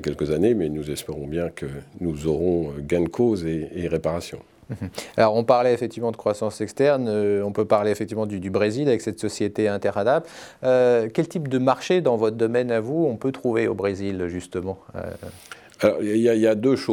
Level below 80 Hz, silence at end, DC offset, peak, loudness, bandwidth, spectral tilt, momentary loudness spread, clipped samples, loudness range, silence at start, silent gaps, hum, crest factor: -50 dBFS; 0 s; under 0.1%; -4 dBFS; -23 LUFS; 17.5 kHz; -6.5 dB/octave; 13 LU; under 0.1%; 4 LU; 0 s; none; none; 18 dB